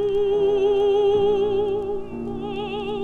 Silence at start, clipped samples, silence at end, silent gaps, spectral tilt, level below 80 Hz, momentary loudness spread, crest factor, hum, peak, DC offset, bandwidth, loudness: 0 s; under 0.1%; 0 s; none; -7 dB/octave; -44 dBFS; 11 LU; 10 dB; none; -12 dBFS; under 0.1%; 6.6 kHz; -22 LUFS